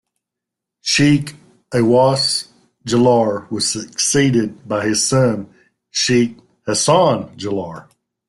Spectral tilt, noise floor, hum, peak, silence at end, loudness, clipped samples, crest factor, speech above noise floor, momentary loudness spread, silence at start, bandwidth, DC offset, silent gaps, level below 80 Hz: -4 dB/octave; -83 dBFS; none; -2 dBFS; 0.45 s; -16 LUFS; under 0.1%; 16 dB; 67 dB; 12 LU; 0.85 s; 12.5 kHz; under 0.1%; none; -54 dBFS